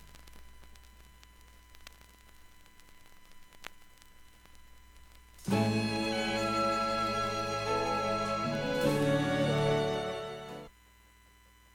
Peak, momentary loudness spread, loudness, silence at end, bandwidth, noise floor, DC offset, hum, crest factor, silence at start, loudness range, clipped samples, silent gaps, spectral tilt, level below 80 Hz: -16 dBFS; 21 LU; -31 LUFS; 1.05 s; 17.5 kHz; -61 dBFS; under 0.1%; none; 18 dB; 0 s; 6 LU; under 0.1%; none; -5.5 dB/octave; -56 dBFS